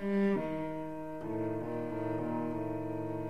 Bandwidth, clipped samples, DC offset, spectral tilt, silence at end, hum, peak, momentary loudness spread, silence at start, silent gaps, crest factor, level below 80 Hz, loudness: 13.5 kHz; under 0.1%; 0.3%; -9 dB/octave; 0 s; none; -22 dBFS; 8 LU; 0 s; none; 14 dB; -60 dBFS; -36 LUFS